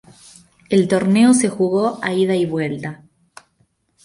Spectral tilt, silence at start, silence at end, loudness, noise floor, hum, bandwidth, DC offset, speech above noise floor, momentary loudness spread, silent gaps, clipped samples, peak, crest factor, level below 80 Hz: -5.5 dB/octave; 0.7 s; 1.1 s; -17 LUFS; -63 dBFS; none; 11.5 kHz; under 0.1%; 47 dB; 11 LU; none; under 0.1%; -2 dBFS; 16 dB; -58 dBFS